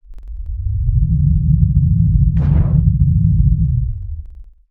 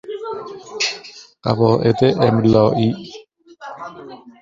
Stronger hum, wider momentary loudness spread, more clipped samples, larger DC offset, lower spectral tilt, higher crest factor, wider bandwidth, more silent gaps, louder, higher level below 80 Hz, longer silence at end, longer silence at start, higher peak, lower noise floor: neither; second, 15 LU vs 23 LU; neither; neither; first, -13 dB/octave vs -6.5 dB/octave; about the same, 14 dB vs 18 dB; second, 2.4 kHz vs 7.6 kHz; neither; about the same, -15 LUFS vs -17 LUFS; first, -18 dBFS vs -50 dBFS; first, 0.3 s vs 0.1 s; about the same, 0.1 s vs 0.05 s; about the same, 0 dBFS vs -2 dBFS; about the same, -35 dBFS vs -37 dBFS